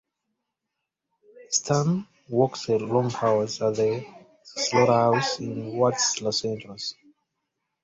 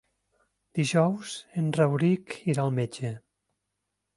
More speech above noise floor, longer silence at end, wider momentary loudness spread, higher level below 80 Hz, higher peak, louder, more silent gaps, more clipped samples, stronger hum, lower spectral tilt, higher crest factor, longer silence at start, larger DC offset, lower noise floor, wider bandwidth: about the same, 59 dB vs 56 dB; about the same, 0.9 s vs 1 s; about the same, 12 LU vs 12 LU; about the same, -64 dBFS vs -68 dBFS; about the same, -6 dBFS vs -8 dBFS; about the same, -25 LUFS vs -27 LUFS; neither; neither; second, none vs 50 Hz at -55 dBFS; second, -4 dB/octave vs -6.5 dB/octave; about the same, 20 dB vs 20 dB; first, 1.35 s vs 0.75 s; neither; about the same, -84 dBFS vs -82 dBFS; second, 8 kHz vs 11.5 kHz